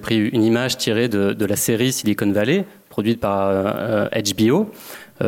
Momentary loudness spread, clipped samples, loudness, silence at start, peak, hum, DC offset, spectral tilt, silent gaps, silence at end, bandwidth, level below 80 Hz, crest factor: 5 LU; under 0.1%; -19 LUFS; 0 s; -6 dBFS; none; under 0.1%; -5 dB/octave; none; 0 s; 17 kHz; -54 dBFS; 14 dB